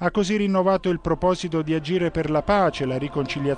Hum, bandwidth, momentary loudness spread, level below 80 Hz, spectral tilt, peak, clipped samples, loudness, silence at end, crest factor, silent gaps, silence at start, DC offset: none; 9.8 kHz; 5 LU; -42 dBFS; -6.5 dB/octave; -8 dBFS; under 0.1%; -22 LUFS; 0 s; 14 dB; none; 0 s; under 0.1%